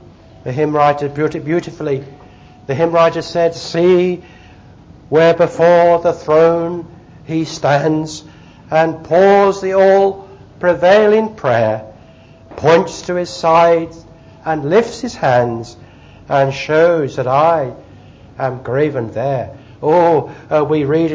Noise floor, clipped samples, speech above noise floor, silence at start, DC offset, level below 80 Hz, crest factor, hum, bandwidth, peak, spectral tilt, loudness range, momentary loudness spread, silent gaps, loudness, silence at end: -41 dBFS; under 0.1%; 28 dB; 0.45 s; under 0.1%; -48 dBFS; 14 dB; none; 7.8 kHz; 0 dBFS; -6.5 dB/octave; 4 LU; 12 LU; none; -14 LUFS; 0 s